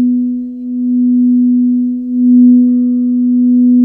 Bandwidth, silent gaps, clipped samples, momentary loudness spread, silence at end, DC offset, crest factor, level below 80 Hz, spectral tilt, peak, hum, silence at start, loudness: 0.5 kHz; none; under 0.1%; 10 LU; 0 s; under 0.1%; 8 dB; -56 dBFS; -13 dB/octave; 0 dBFS; none; 0 s; -11 LUFS